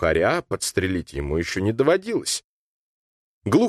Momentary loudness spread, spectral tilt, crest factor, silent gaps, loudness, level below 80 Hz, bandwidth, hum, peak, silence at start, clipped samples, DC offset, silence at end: 8 LU; -4.5 dB/octave; 16 dB; 2.44-3.42 s; -23 LUFS; -42 dBFS; 13 kHz; none; -6 dBFS; 0 s; under 0.1%; under 0.1%; 0 s